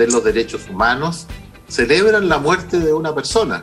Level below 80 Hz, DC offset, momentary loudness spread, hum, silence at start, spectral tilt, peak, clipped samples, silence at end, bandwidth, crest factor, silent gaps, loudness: -38 dBFS; under 0.1%; 12 LU; none; 0 s; -4 dB/octave; 0 dBFS; under 0.1%; 0 s; 13.5 kHz; 16 dB; none; -16 LUFS